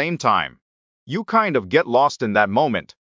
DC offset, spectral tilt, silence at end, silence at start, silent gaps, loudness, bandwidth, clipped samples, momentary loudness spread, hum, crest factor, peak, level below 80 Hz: under 0.1%; -5.5 dB/octave; 0.25 s; 0 s; 0.62-1.07 s; -19 LUFS; 7.6 kHz; under 0.1%; 9 LU; none; 18 dB; -2 dBFS; -56 dBFS